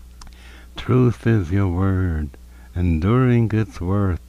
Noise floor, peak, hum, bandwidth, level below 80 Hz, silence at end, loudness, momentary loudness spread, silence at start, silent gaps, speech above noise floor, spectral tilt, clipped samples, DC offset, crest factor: -41 dBFS; -8 dBFS; none; 10 kHz; -34 dBFS; 0 s; -20 LUFS; 14 LU; 0.05 s; none; 22 dB; -9 dB/octave; under 0.1%; under 0.1%; 12 dB